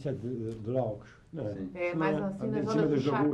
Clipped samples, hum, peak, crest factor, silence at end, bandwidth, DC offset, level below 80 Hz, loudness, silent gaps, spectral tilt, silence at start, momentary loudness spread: under 0.1%; none; -16 dBFS; 14 dB; 0 s; 9.6 kHz; under 0.1%; -60 dBFS; -32 LUFS; none; -8 dB/octave; 0 s; 11 LU